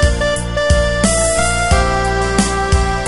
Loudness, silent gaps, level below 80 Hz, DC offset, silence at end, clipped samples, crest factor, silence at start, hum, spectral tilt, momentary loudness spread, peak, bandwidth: -15 LUFS; none; -20 dBFS; 2%; 0 s; under 0.1%; 14 dB; 0 s; none; -4 dB/octave; 3 LU; 0 dBFS; 11.5 kHz